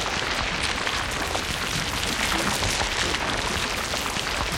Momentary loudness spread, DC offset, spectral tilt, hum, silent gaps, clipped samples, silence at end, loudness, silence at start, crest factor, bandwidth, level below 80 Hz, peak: 3 LU; under 0.1%; -2 dB/octave; none; none; under 0.1%; 0 s; -24 LUFS; 0 s; 18 dB; 17 kHz; -38 dBFS; -8 dBFS